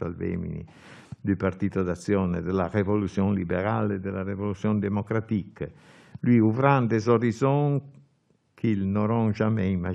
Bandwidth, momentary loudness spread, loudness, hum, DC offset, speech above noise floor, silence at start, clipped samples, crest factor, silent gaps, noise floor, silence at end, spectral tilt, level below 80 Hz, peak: 9.4 kHz; 10 LU; -26 LUFS; none; under 0.1%; 42 dB; 0 s; under 0.1%; 20 dB; none; -67 dBFS; 0 s; -8.5 dB/octave; -56 dBFS; -4 dBFS